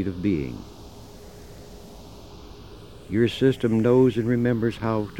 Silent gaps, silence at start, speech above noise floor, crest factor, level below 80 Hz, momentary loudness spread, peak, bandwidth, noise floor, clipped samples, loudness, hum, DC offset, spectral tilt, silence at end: none; 0 s; 21 dB; 18 dB; -48 dBFS; 25 LU; -8 dBFS; 17 kHz; -43 dBFS; under 0.1%; -23 LUFS; none; 0.3%; -8 dB/octave; 0 s